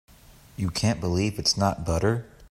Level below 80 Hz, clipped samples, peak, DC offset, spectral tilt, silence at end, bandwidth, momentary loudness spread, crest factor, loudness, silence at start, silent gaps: -46 dBFS; under 0.1%; -8 dBFS; under 0.1%; -5 dB/octave; 0.05 s; 15.5 kHz; 9 LU; 18 dB; -25 LUFS; 0.6 s; none